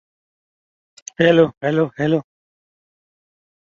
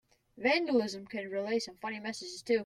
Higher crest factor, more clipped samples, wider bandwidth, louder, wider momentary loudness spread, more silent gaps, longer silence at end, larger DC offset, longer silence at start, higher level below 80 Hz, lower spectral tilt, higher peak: about the same, 20 dB vs 16 dB; neither; second, 7.6 kHz vs 12.5 kHz; first, -17 LUFS vs -33 LUFS; first, 17 LU vs 11 LU; first, 1.57-1.61 s vs none; first, 1.4 s vs 0 s; neither; first, 1.2 s vs 0.35 s; first, -60 dBFS vs -74 dBFS; first, -6 dB/octave vs -4 dB/octave; first, -2 dBFS vs -16 dBFS